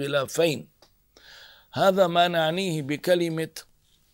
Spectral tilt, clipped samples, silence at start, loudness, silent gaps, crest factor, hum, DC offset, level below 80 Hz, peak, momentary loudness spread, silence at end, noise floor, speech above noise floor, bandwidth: -5 dB/octave; under 0.1%; 0 s; -24 LUFS; none; 18 dB; none; under 0.1%; -66 dBFS; -8 dBFS; 14 LU; 0.5 s; -59 dBFS; 35 dB; 16 kHz